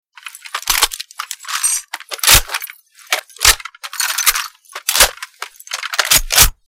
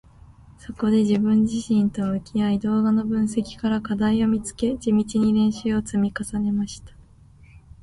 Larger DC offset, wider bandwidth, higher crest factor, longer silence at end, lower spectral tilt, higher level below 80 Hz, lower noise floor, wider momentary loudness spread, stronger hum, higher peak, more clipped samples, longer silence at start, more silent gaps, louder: neither; first, over 20 kHz vs 11.5 kHz; about the same, 18 dB vs 14 dB; second, 0.15 s vs 0.95 s; second, 0.5 dB/octave vs -6.5 dB/octave; first, -30 dBFS vs -48 dBFS; second, -36 dBFS vs -50 dBFS; first, 19 LU vs 7 LU; neither; first, 0 dBFS vs -10 dBFS; neither; second, 0.25 s vs 0.5 s; neither; first, -14 LUFS vs -22 LUFS